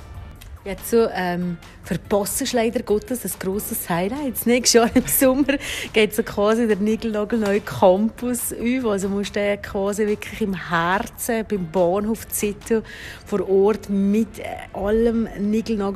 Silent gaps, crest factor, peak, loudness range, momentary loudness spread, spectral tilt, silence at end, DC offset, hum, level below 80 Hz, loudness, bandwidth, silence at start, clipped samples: none; 20 dB; -2 dBFS; 4 LU; 10 LU; -4.5 dB/octave; 0 s; under 0.1%; none; -44 dBFS; -21 LUFS; 15 kHz; 0 s; under 0.1%